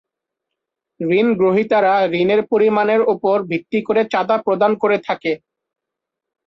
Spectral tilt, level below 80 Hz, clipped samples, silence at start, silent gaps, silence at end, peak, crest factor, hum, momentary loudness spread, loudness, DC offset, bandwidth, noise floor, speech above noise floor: -7.5 dB/octave; -62 dBFS; under 0.1%; 1 s; none; 1.1 s; -4 dBFS; 14 dB; none; 7 LU; -17 LUFS; under 0.1%; 6.2 kHz; -83 dBFS; 66 dB